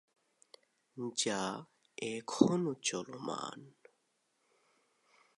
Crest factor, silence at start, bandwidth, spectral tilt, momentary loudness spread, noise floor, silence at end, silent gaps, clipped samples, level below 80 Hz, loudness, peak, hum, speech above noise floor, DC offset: 30 dB; 0.95 s; 11.5 kHz; -4 dB/octave; 18 LU; -79 dBFS; 1.7 s; none; under 0.1%; -82 dBFS; -36 LUFS; -10 dBFS; none; 43 dB; under 0.1%